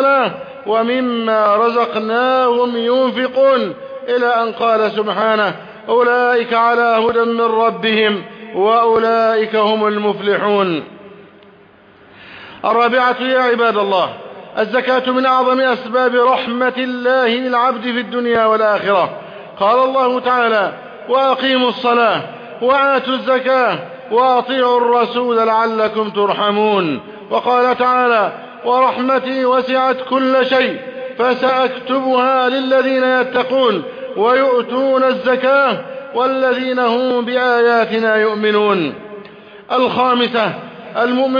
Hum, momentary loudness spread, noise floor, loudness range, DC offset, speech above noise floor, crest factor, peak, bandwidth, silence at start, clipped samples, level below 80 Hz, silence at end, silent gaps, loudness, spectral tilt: none; 8 LU; -45 dBFS; 2 LU; under 0.1%; 31 dB; 12 dB; -2 dBFS; 5.2 kHz; 0 s; under 0.1%; -64 dBFS; 0 s; none; -15 LUFS; -6.5 dB/octave